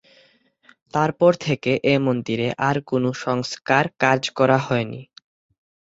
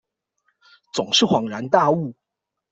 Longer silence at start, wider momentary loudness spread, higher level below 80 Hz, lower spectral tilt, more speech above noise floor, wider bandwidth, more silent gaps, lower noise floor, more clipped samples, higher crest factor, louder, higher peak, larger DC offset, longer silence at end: about the same, 0.95 s vs 0.95 s; second, 7 LU vs 12 LU; first, -58 dBFS vs -64 dBFS; first, -6 dB/octave vs -4 dB/octave; second, 38 dB vs 64 dB; about the same, 8 kHz vs 8.2 kHz; neither; second, -58 dBFS vs -83 dBFS; neither; about the same, 20 dB vs 20 dB; about the same, -21 LUFS vs -20 LUFS; about the same, -2 dBFS vs -4 dBFS; neither; first, 0.9 s vs 0.6 s